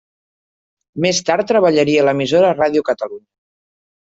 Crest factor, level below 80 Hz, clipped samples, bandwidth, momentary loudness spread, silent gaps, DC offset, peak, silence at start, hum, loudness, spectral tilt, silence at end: 16 dB; -58 dBFS; under 0.1%; 8 kHz; 9 LU; none; under 0.1%; -2 dBFS; 0.95 s; none; -15 LUFS; -4.5 dB/octave; 1 s